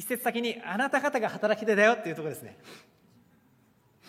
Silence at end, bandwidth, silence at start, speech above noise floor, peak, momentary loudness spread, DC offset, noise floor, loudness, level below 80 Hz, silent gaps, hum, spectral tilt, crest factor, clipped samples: 1.3 s; 16 kHz; 0 s; 36 dB; -8 dBFS; 15 LU; under 0.1%; -64 dBFS; -27 LUFS; -80 dBFS; none; none; -4 dB/octave; 22 dB; under 0.1%